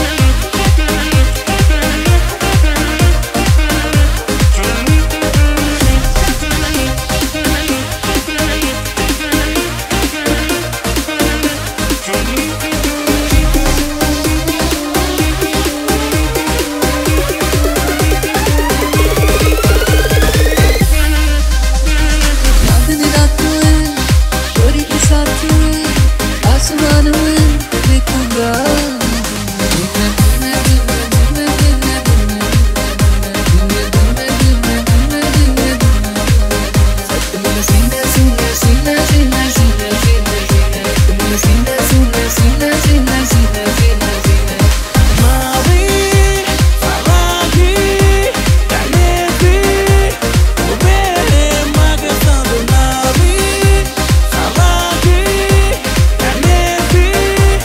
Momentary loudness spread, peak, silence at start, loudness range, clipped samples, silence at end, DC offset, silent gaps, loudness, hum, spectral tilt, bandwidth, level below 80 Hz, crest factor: 4 LU; 0 dBFS; 0 s; 3 LU; under 0.1%; 0 s; under 0.1%; none; -12 LUFS; none; -4.5 dB/octave; 16.5 kHz; -14 dBFS; 10 dB